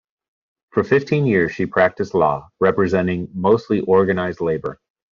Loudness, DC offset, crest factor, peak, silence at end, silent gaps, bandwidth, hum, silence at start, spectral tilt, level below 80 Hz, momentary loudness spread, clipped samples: -19 LUFS; under 0.1%; 16 dB; -2 dBFS; 0.35 s; none; 7.2 kHz; none; 0.75 s; -6.5 dB/octave; -54 dBFS; 7 LU; under 0.1%